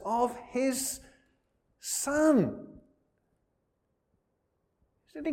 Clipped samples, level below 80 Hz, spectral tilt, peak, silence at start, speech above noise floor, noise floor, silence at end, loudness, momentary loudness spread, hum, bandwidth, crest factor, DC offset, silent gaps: under 0.1%; -64 dBFS; -4 dB/octave; -12 dBFS; 0 s; 49 dB; -78 dBFS; 0 s; -29 LUFS; 18 LU; none; 16.5 kHz; 20 dB; under 0.1%; none